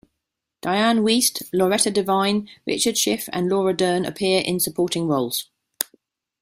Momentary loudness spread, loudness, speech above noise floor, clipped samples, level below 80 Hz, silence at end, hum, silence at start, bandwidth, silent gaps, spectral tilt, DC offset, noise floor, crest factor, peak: 10 LU; -21 LUFS; 60 dB; under 0.1%; -60 dBFS; 0.6 s; none; 0.65 s; 16 kHz; none; -3.5 dB/octave; under 0.1%; -81 dBFS; 22 dB; 0 dBFS